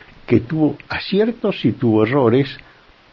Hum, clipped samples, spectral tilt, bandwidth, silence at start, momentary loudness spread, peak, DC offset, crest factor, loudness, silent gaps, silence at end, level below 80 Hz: none; under 0.1%; -9.5 dB/octave; 6 kHz; 0.3 s; 8 LU; 0 dBFS; under 0.1%; 18 dB; -18 LUFS; none; 0.55 s; -50 dBFS